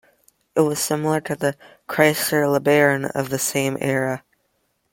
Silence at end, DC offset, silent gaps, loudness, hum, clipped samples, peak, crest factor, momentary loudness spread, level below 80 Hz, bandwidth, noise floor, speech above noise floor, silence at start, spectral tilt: 0.75 s; under 0.1%; none; -20 LUFS; none; under 0.1%; -2 dBFS; 20 dB; 9 LU; -62 dBFS; 16.5 kHz; -69 dBFS; 49 dB; 0.55 s; -4.5 dB/octave